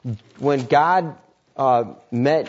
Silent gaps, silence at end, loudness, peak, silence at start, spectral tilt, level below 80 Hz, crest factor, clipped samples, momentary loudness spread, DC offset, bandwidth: none; 0 s; -20 LUFS; -4 dBFS; 0.05 s; -7 dB/octave; -66 dBFS; 16 dB; under 0.1%; 16 LU; under 0.1%; 8 kHz